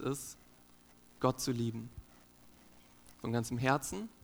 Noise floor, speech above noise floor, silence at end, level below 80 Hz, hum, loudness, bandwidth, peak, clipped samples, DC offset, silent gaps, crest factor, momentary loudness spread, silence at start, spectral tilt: -62 dBFS; 26 dB; 0.15 s; -62 dBFS; 60 Hz at -65 dBFS; -36 LUFS; 19 kHz; -14 dBFS; under 0.1%; under 0.1%; none; 24 dB; 17 LU; 0 s; -5 dB/octave